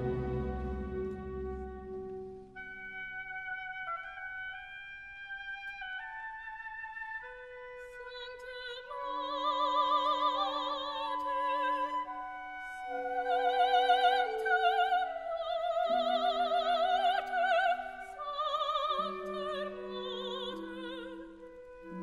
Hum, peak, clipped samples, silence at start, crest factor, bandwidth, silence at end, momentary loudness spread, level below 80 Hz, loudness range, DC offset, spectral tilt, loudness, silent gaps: none; -16 dBFS; under 0.1%; 0 s; 20 dB; 12 kHz; 0 s; 16 LU; -54 dBFS; 12 LU; under 0.1%; -5 dB/octave; -34 LUFS; none